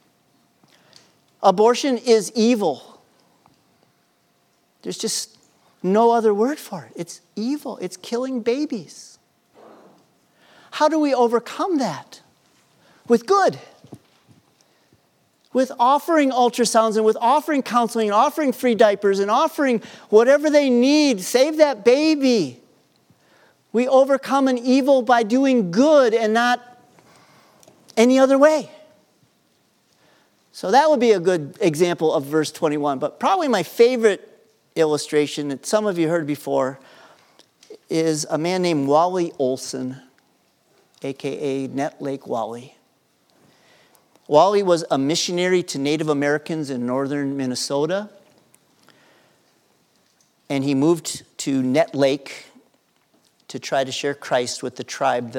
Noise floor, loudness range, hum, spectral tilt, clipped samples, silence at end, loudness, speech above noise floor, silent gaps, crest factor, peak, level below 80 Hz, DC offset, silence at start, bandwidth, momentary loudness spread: -63 dBFS; 10 LU; none; -4.5 dB/octave; under 0.1%; 0 s; -19 LUFS; 44 dB; none; 20 dB; 0 dBFS; -80 dBFS; under 0.1%; 1.4 s; 17.5 kHz; 13 LU